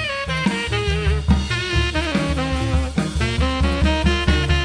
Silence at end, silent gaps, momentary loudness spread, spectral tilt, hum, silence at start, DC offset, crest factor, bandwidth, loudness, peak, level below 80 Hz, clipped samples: 0 s; none; 3 LU; -5.5 dB/octave; none; 0 s; under 0.1%; 16 dB; 10.5 kHz; -20 LUFS; -4 dBFS; -24 dBFS; under 0.1%